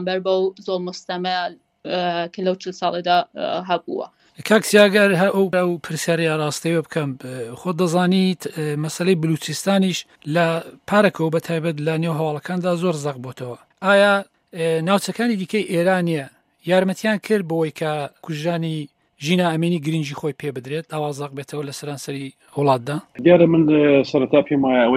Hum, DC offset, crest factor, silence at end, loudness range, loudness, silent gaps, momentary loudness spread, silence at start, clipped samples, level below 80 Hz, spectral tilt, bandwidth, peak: none; under 0.1%; 20 dB; 0 s; 5 LU; -20 LUFS; none; 14 LU; 0 s; under 0.1%; -66 dBFS; -5.5 dB/octave; 16 kHz; 0 dBFS